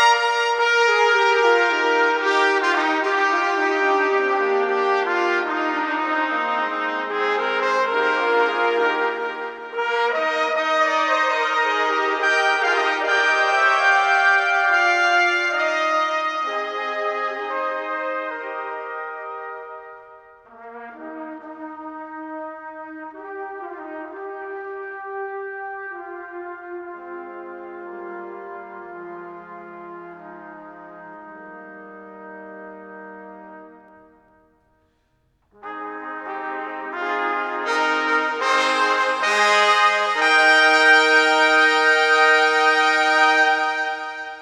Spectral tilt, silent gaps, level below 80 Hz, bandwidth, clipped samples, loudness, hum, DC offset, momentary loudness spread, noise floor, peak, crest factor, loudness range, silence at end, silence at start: -1 dB/octave; none; -72 dBFS; 12 kHz; under 0.1%; -18 LUFS; none; under 0.1%; 22 LU; -65 dBFS; -2 dBFS; 18 dB; 22 LU; 0 s; 0 s